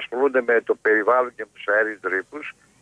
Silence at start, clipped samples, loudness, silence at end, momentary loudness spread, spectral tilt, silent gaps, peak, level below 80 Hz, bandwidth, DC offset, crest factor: 0 s; under 0.1%; -21 LUFS; 0.3 s; 15 LU; -4.5 dB/octave; none; -8 dBFS; -72 dBFS; 10 kHz; under 0.1%; 14 dB